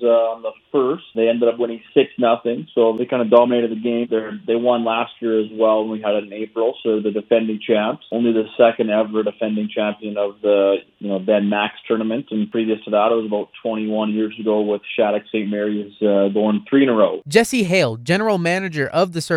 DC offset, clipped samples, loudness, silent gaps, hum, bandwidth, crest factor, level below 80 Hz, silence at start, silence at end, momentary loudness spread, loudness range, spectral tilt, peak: under 0.1%; under 0.1%; -19 LUFS; none; none; 14.5 kHz; 18 dB; -66 dBFS; 0 s; 0 s; 7 LU; 3 LU; -6 dB/octave; 0 dBFS